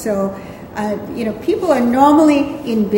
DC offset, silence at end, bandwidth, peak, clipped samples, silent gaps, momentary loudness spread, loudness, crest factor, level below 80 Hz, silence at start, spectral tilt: under 0.1%; 0 s; 16.5 kHz; 0 dBFS; under 0.1%; none; 13 LU; -15 LUFS; 14 dB; -48 dBFS; 0 s; -6.5 dB/octave